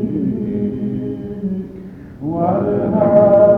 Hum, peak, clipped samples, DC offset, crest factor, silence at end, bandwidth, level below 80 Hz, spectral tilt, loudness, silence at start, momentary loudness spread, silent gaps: none; -2 dBFS; under 0.1%; under 0.1%; 14 dB; 0 s; 3.4 kHz; -44 dBFS; -11.5 dB/octave; -17 LUFS; 0 s; 17 LU; none